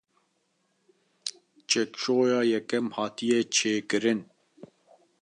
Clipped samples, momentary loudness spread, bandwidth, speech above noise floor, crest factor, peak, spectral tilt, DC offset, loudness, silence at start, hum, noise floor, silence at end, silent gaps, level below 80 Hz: under 0.1%; 13 LU; 11 kHz; 47 dB; 20 dB; -8 dBFS; -3 dB/octave; under 0.1%; -27 LUFS; 1.25 s; none; -73 dBFS; 1 s; none; -78 dBFS